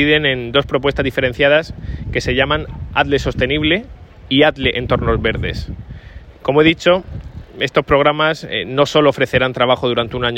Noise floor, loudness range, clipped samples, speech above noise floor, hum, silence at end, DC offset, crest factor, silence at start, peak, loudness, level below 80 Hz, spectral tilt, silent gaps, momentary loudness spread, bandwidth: -36 dBFS; 2 LU; under 0.1%; 20 dB; none; 0 s; under 0.1%; 16 dB; 0 s; 0 dBFS; -16 LUFS; -32 dBFS; -5.5 dB/octave; none; 13 LU; 16 kHz